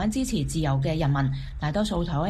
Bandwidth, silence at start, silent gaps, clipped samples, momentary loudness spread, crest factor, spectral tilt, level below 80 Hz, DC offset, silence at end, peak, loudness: 13 kHz; 0 s; none; under 0.1%; 4 LU; 12 dB; -6 dB/octave; -36 dBFS; under 0.1%; 0 s; -14 dBFS; -26 LUFS